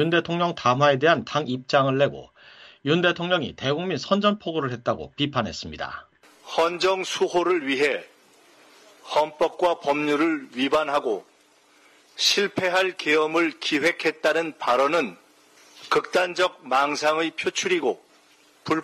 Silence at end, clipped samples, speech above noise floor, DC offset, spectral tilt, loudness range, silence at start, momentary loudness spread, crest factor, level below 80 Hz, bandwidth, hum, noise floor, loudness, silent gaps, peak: 0 s; under 0.1%; 35 dB; under 0.1%; -4 dB/octave; 3 LU; 0 s; 9 LU; 18 dB; -62 dBFS; 13.5 kHz; none; -58 dBFS; -23 LUFS; none; -6 dBFS